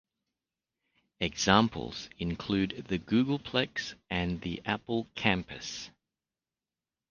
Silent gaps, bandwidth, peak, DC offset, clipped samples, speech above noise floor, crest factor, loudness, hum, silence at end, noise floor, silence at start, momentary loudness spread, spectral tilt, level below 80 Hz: none; 9.8 kHz; -6 dBFS; under 0.1%; under 0.1%; over 59 dB; 26 dB; -31 LUFS; none; 1.2 s; under -90 dBFS; 1.2 s; 14 LU; -4.5 dB/octave; -54 dBFS